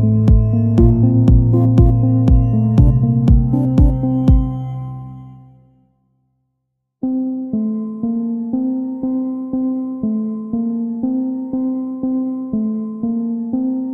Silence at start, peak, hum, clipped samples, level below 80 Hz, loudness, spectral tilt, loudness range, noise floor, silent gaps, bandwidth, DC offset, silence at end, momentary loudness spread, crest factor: 0 s; 0 dBFS; none; under 0.1%; -22 dBFS; -16 LUFS; -11.5 dB/octave; 11 LU; -73 dBFS; none; 3.6 kHz; under 0.1%; 0 s; 10 LU; 16 dB